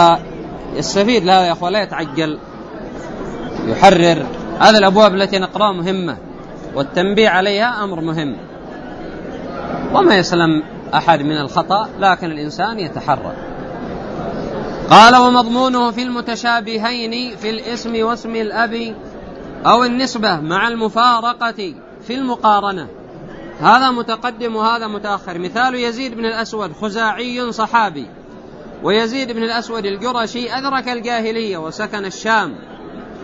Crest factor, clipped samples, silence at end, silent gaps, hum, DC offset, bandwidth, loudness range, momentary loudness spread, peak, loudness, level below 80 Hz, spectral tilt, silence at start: 16 dB; 0.1%; 0 s; none; none; under 0.1%; 11 kHz; 7 LU; 18 LU; 0 dBFS; -15 LUFS; -44 dBFS; -4.5 dB/octave; 0 s